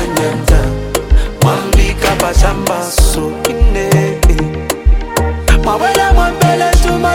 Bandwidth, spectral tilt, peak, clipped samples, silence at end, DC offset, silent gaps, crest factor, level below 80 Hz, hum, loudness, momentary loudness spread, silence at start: 17 kHz; -5 dB/octave; 0 dBFS; under 0.1%; 0 s; under 0.1%; none; 10 dB; -14 dBFS; none; -13 LUFS; 5 LU; 0 s